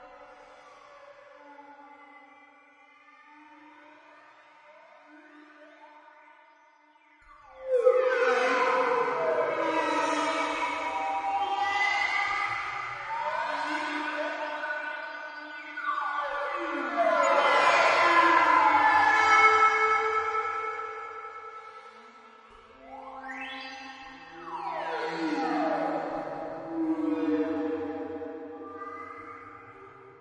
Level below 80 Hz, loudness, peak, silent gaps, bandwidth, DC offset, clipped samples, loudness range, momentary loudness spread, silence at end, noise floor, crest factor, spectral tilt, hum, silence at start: -70 dBFS; -26 LUFS; -8 dBFS; none; 11 kHz; under 0.1%; under 0.1%; 15 LU; 21 LU; 0.1 s; -60 dBFS; 22 dB; -3 dB/octave; none; 0 s